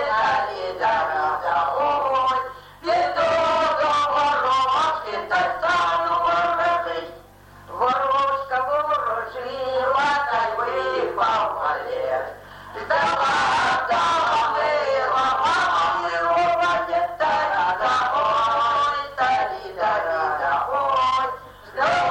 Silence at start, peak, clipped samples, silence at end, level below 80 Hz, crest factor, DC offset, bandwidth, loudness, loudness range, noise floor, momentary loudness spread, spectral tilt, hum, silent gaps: 0 s; -8 dBFS; under 0.1%; 0 s; -54 dBFS; 14 dB; under 0.1%; 16.5 kHz; -21 LUFS; 3 LU; -46 dBFS; 7 LU; -3 dB/octave; none; none